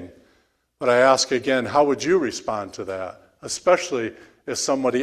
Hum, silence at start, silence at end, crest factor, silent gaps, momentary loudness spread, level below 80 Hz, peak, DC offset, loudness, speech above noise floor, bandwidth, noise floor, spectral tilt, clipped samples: none; 0 s; 0 s; 18 dB; none; 15 LU; -60 dBFS; -4 dBFS; under 0.1%; -21 LUFS; 43 dB; 14 kHz; -64 dBFS; -3 dB/octave; under 0.1%